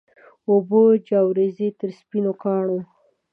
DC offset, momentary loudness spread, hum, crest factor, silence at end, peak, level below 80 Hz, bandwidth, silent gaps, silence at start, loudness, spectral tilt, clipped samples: under 0.1%; 12 LU; none; 16 dB; 0.5 s; -6 dBFS; -78 dBFS; 5 kHz; none; 0.5 s; -20 LUFS; -11 dB/octave; under 0.1%